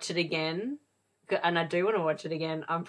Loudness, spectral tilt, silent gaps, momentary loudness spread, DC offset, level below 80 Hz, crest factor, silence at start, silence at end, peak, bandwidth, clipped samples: -30 LUFS; -5 dB/octave; none; 8 LU; under 0.1%; -78 dBFS; 18 dB; 0 s; 0 s; -12 dBFS; 10.5 kHz; under 0.1%